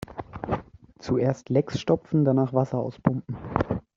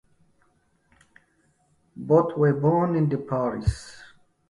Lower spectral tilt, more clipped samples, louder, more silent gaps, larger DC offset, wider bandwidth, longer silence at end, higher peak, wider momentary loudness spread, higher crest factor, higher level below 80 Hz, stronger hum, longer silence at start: about the same, -8.5 dB/octave vs -8.5 dB/octave; neither; second, -26 LUFS vs -23 LUFS; neither; neither; second, 7.6 kHz vs 11.5 kHz; second, 0.15 s vs 0.45 s; about the same, -4 dBFS vs -6 dBFS; second, 10 LU vs 18 LU; about the same, 22 dB vs 20 dB; second, -50 dBFS vs -44 dBFS; neither; second, 0.1 s vs 1.95 s